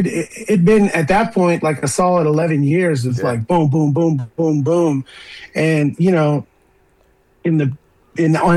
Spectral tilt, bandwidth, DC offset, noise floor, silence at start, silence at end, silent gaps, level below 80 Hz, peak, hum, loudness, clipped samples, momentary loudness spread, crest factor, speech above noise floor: -7 dB/octave; 12.5 kHz; under 0.1%; -55 dBFS; 0 s; 0 s; none; -46 dBFS; -6 dBFS; none; -16 LUFS; under 0.1%; 9 LU; 10 dB; 40 dB